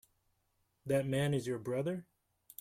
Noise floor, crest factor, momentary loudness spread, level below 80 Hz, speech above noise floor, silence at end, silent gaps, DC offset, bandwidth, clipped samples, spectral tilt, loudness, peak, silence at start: -79 dBFS; 16 dB; 15 LU; -70 dBFS; 44 dB; 0.6 s; none; under 0.1%; 16 kHz; under 0.1%; -6.5 dB/octave; -36 LUFS; -20 dBFS; 0.85 s